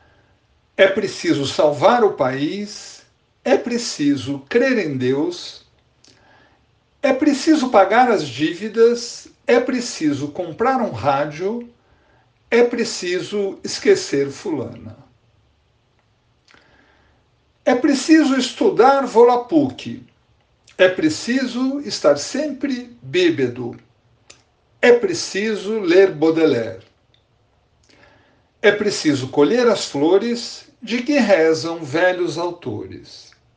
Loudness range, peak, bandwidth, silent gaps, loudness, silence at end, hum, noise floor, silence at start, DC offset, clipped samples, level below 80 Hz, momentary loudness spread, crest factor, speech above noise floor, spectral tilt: 5 LU; 0 dBFS; 9.8 kHz; none; -18 LUFS; 0.35 s; none; -61 dBFS; 0.8 s; under 0.1%; under 0.1%; -62 dBFS; 14 LU; 18 dB; 43 dB; -4.5 dB/octave